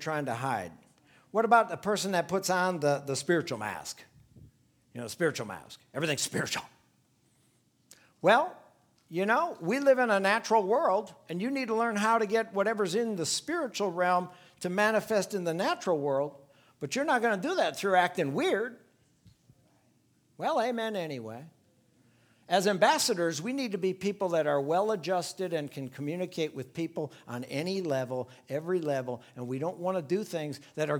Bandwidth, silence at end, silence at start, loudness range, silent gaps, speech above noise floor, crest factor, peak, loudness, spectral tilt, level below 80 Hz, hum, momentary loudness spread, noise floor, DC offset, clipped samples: 19 kHz; 0 s; 0 s; 7 LU; none; 39 dB; 22 dB; -8 dBFS; -30 LUFS; -4 dB/octave; -76 dBFS; none; 14 LU; -69 dBFS; under 0.1%; under 0.1%